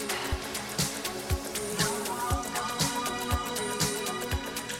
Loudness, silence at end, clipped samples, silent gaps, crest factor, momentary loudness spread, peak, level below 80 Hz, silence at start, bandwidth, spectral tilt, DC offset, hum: -30 LUFS; 0 s; under 0.1%; none; 18 dB; 4 LU; -14 dBFS; -42 dBFS; 0 s; 16.5 kHz; -3 dB/octave; under 0.1%; none